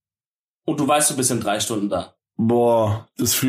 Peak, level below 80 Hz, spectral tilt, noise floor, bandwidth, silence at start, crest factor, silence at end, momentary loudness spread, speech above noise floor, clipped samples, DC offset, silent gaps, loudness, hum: -6 dBFS; -58 dBFS; -4 dB/octave; under -90 dBFS; 15.5 kHz; 0.65 s; 16 dB; 0 s; 10 LU; over 70 dB; under 0.1%; under 0.1%; none; -20 LUFS; none